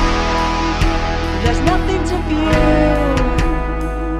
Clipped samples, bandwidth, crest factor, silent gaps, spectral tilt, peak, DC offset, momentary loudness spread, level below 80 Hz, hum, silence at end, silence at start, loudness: under 0.1%; 12 kHz; 14 dB; none; -6 dB/octave; -2 dBFS; under 0.1%; 6 LU; -20 dBFS; none; 0 s; 0 s; -17 LUFS